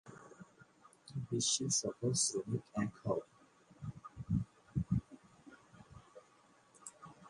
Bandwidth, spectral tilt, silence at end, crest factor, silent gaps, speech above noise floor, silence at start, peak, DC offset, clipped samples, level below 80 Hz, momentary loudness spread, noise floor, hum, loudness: 11.5 kHz; -4 dB/octave; 0 s; 22 dB; none; 31 dB; 0.05 s; -20 dBFS; under 0.1%; under 0.1%; -60 dBFS; 25 LU; -68 dBFS; none; -37 LUFS